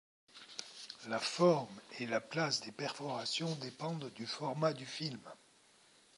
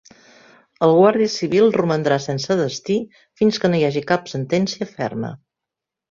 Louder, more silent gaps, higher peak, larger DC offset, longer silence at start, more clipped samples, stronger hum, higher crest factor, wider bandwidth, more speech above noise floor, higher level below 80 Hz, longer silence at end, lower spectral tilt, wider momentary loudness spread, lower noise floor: second, -38 LUFS vs -19 LUFS; neither; second, -16 dBFS vs -2 dBFS; neither; second, 0.35 s vs 0.8 s; neither; neither; about the same, 22 dB vs 18 dB; first, 11.5 kHz vs 7.6 kHz; second, 29 dB vs 66 dB; second, -86 dBFS vs -60 dBFS; about the same, 0.8 s vs 0.75 s; second, -4.5 dB/octave vs -6 dB/octave; first, 17 LU vs 11 LU; second, -67 dBFS vs -85 dBFS